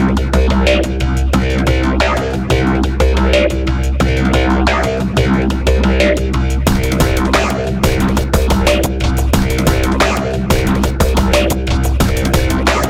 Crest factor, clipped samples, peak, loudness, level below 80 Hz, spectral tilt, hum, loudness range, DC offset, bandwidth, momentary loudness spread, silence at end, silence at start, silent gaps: 12 dB; under 0.1%; 0 dBFS; -14 LUFS; -16 dBFS; -5.5 dB/octave; none; 0 LU; 0.3%; 17 kHz; 3 LU; 0 s; 0 s; none